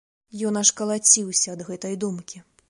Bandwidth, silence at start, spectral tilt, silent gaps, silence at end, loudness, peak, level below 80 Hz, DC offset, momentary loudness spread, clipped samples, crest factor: 11.5 kHz; 0.35 s; -2.5 dB/octave; none; 0.3 s; -20 LUFS; -2 dBFS; -70 dBFS; under 0.1%; 19 LU; under 0.1%; 22 dB